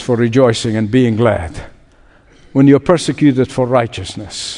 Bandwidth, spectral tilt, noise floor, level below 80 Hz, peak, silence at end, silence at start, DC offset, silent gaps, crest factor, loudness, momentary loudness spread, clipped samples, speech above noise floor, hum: 11 kHz; -6.5 dB/octave; -46 dBFS; -42 dBFS; 0 dBFS; 0 s; 0 s; under 0.1%; none; 14 dB; -13 LUFS; 14 LU; under 0.1%; 33 dB; none